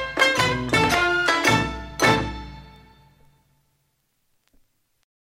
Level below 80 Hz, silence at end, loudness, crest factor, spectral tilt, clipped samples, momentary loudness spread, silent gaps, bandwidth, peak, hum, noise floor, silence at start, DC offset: -42 dBFS; 2.6 s; -20 LUFS; 22 dB; -3.5 dB/octave; under 0.1%; 13 LU; none; 16 kHz; -4 dBFS; none; -70 dBFS; 0 s; under 0.1%